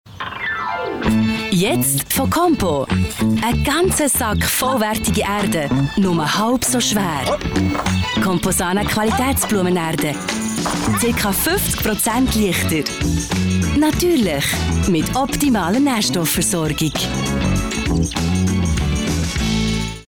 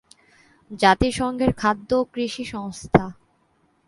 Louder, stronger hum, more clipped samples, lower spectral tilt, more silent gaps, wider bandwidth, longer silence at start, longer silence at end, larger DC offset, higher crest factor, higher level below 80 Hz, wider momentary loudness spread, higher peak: first, -18 LUFS vs -22 LUFS; neither; neither; about the same, -4.5 dB/octave vs -5.5 dB/octave; neither; first, over 20 kHz vs 11.5 kHz; second, 0.05 s vs 0.7 s; second, 0.1 s vs 0.75 s; neither; second, 10 dB vs 22 dB; first, -32 dBFS vs -42 dBFS; second, 4 LU vs 14 LU; second, -6 dBFS vs 0 dBFS